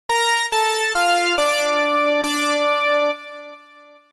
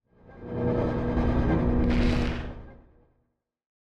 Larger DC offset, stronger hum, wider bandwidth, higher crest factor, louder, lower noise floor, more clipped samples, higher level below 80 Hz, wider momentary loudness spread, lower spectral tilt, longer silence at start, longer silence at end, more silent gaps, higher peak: neither; neither; first, 13 kHz vs 8.4 kHz; about the same, 12 dB vs 16 dB; first, -18 LUFS vs -27 LUFS; second, -47 dBFS vs -75 dBFS; neither; second, -58 dBFS vs -32 dBFS; second, 5 LU vs 15 LU; second, 0 dB/octave vs -8.5 dB/octave; second, 0.1 s vs 0.3 s; second, 0.55 s vs 1.25 s; neither; first, -8 dBFS vs -12 dBFS